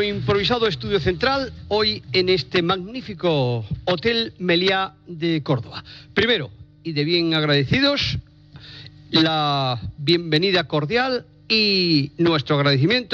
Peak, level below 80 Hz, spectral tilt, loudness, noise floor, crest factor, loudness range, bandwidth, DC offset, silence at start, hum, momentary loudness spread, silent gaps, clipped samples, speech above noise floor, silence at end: -4 dBFS; -48 dBFS; -6.5 dB/octave; -20 LUFS; -43 dBFS; 18 dB; 3 LU; 7.4 kHz; under 0.1%; 0 s; none; 10 LU; none; under 0.1%; 23 dB; 0 s